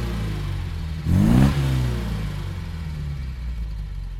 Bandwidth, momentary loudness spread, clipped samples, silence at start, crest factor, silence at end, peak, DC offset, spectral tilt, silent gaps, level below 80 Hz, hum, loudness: 16 kHz; 14 LU; under 0.1%; 0 s; 18 dB; 0 s; -4 dBFS; under 0.1%; -7.5 dB/octave; none; -28 dBFS; none; -24 LUFS